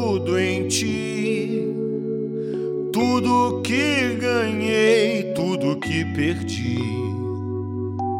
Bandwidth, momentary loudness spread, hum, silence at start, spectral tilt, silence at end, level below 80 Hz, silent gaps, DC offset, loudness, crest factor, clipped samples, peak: 16 kHz; 8 LU; none; 0 s; -5 dB/octave; 0 s; -56 dBFS; none; under 0.1%; -22 LUFS; 16 dB; under 0.1%; -6 dBFS